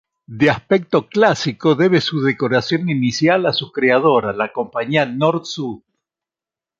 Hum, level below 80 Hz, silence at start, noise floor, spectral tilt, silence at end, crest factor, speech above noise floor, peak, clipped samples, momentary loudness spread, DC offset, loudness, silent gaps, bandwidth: none; -56 dBFS; 0.3 s; -89 dBFS; -5.5 dB/octave; 1.05 s; 16 dB; 72 dB; -2 dBFS; under 0.1%; 8 LU; under 0.1%; -17 LUFS; none; 7.8 kHz